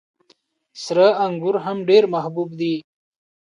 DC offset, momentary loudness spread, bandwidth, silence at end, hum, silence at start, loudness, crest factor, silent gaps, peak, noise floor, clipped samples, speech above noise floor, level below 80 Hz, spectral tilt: under 0.1%; 11 LU; 10.5 kHz; 0.6 s; none; 0.75 s; -19 LUFS; 18 dB; none; -4 dBFS; -61 dBFS; under 0.1%; 42 dB; -72 dBFS; -6 dB/octave